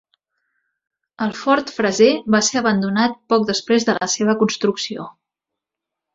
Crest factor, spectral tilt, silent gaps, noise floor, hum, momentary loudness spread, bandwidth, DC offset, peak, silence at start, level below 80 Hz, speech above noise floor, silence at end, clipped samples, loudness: 18 dB; -4 dB/octave; none; -84 dBFS; none; 10 LU; 7.8 kHz; under 0.1%; -2 dBFS; 1.2 s; -62 dBFS; 66 dB; 1.05 s; under 0.1%; -18 LUFS